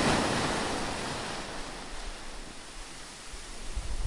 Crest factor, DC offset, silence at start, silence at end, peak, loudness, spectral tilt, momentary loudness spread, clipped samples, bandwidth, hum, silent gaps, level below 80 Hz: 20 dB; under 0.1%; 0 s; 0 s; -12 dBFS; -35 LUFS; -3.5 dB/octave; 15 LU; under 0.1%; 11.5 kHz; none; none; -42 dBFS